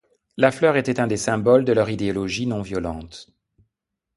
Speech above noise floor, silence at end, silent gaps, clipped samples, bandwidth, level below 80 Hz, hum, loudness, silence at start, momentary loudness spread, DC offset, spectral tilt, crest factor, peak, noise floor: 60 dB; 0.95 s; none; under 0.1%; 11.5 kHz; -48 dBFS; none; -21 LUFS; 0.35 s; 18 LU; under 0.1%; -5.5 dB/octave; 22 dB; 0 dBFS; -81 dBFS